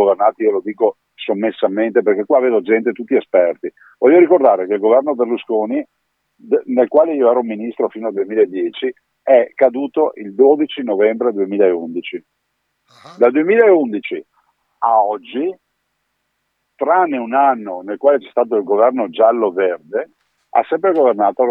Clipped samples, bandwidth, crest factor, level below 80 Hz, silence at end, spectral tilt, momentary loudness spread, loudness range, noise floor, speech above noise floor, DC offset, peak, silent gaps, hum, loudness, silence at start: under 0.1%; 4.1 kHz; 16 dB; -76 dBFS; 0 s; -8 dB/octave; 12 LU; 4 LU; -70 dBFS; 55 dB; under 0.1%; 0 dBFS; none; none; -15 LUFS; 0 s